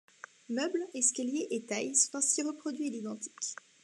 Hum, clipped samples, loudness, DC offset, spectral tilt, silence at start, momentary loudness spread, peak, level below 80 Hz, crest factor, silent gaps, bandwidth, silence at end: none; under 0.1%; -32 LUFS; under 0.1%; -1.5 dB/octave; 0.5 s; 12 LU; -12 dBFS; under -90 dBFS; 22 dB; none; 12.5 kHz; 0.3 s